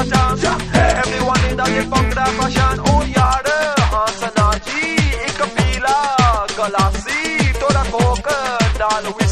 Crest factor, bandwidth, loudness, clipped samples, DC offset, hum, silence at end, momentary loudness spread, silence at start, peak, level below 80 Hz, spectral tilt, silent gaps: 16 dB; 14 kHz; -16 LUFS; under 0.1%; under 0.1%; none; 0 s; 4 LU; 0 s; 0 dBFS; -24 dBFS; -4.5 dB/octave; none